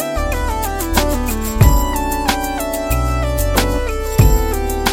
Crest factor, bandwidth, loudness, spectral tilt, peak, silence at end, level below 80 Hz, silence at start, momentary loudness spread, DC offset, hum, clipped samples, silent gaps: 16 dB; 17 kHz; -17 LUFS; -5 dB/octave; 0 dBFS; 0 s; -18 dBFS; 0 s; 7 LU; under 0.1%; none; under 0.1%; none